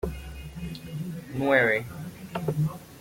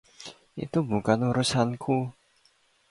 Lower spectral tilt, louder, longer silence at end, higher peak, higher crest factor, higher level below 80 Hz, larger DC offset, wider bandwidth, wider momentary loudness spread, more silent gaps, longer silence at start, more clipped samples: about the same, -6.5 dB/octave vs -5.5 dB/octave; about the same, -28 LUFS vs -27 LUFS; second, 0 s vs 0.8 s; about the same, -8 dBFS vs -8 dBFS; about the same, 22 dB vs 20 dB; first, -46 dBFS vs -60 dBFS; neither; first, 16.5 kHz vs 11.5 kHz; about the same, 18 LU vs 17 LU; neither; second, 0.05 s vs 0.2 s; neither